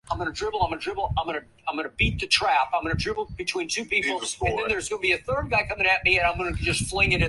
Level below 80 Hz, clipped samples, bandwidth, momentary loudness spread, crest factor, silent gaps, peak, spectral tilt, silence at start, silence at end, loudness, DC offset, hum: -38 dBFS; under 0.1%; 11.5 kHz; 9 LU; 20 dB; none; -6 dBFS; -3.5 dB/octave; 0.05 s; 0 s; -24 LUFS; under 0.1%; none